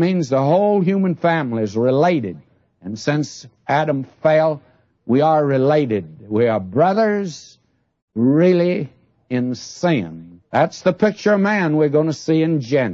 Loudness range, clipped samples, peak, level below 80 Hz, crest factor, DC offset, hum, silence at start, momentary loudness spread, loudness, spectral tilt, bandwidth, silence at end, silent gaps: 2 LU; under 0.1%; -4 dBFS; -64 dBFS; 14 dB; under 0.1%; none; 0 s; 11 LU; -18 LUFS; -7 dB/octave; 7.8 kHz; 0 s; 8.02-8.08 s